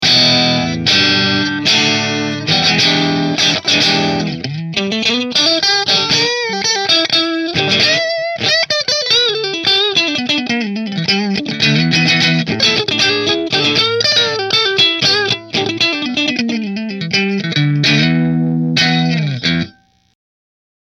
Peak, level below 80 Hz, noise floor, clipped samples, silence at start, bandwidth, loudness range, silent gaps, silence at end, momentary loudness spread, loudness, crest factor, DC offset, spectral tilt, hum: 0 dBFS; -50 dBFS; -42 dBFS; under 0.1%; 0 s; 14.5 kHz; 3 LU; none; 1.15 s; 7 LU; -12 LUFS; 14 dB; under 0.1%; -3.5 dB/octave; none